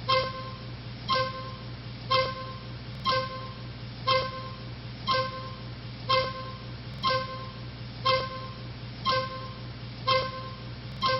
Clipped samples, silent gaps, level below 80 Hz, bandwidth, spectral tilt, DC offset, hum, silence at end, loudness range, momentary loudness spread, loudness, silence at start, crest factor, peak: under 0.1%; none; -50 dBFS; 5.8 kHz; -2.5 dB/octave; under 0.1%; none; 0 s; 1 LU; 13 LU; -31 LUFS; 0 s; 20 dB; -12 dBFS